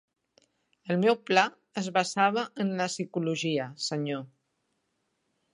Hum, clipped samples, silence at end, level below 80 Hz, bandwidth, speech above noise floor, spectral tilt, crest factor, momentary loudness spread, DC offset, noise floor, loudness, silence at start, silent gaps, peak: none; under 0.1%; 1.3 s; -82 dBFS; 11 kHz; 50 dB; -4.5 dB/octave; 24 dB; 9 LU; under 0.1%; -77 dBFS; -28 LUFS; 0.85 s; none; -6 dBFS